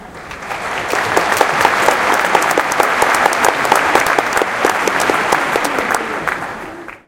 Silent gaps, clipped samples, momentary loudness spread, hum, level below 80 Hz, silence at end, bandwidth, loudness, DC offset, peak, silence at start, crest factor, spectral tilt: none; 0.1%; 11 LU; none; -46 dBFS; 0.1 s; 17.5 kHz; -14 LUFS; under 0.1%; 0 dBFS; 0 s; 16 dB; -2 dB/octave